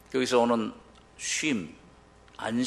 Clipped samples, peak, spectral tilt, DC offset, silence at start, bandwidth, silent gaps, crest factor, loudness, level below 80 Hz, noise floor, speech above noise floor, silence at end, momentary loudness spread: under 0.1%; -12 dBFS; -3.5 dB/octave; under 0.1%; 0.1 s; 12.5 kHz; none; 18 dB; -28 LUFS; -62 dBFS; -55 dBFS; 28 dB; 0 s; 13 LU